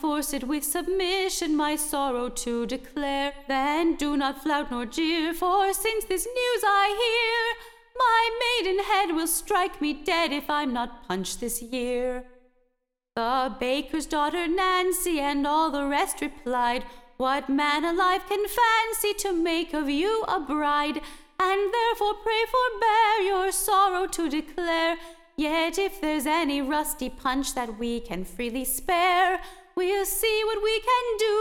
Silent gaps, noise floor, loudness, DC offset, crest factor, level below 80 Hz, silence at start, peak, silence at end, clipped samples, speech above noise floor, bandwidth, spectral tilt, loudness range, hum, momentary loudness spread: none; -76 dBFS; -25 LUFS; under 0.1%; 14 dB; -48 dBFS; 0 s; -12 dBFS; 0 s; under 0.1%; 51 dB; 18 kHz; -2 dB/octave; 4 LU; none; 9 LU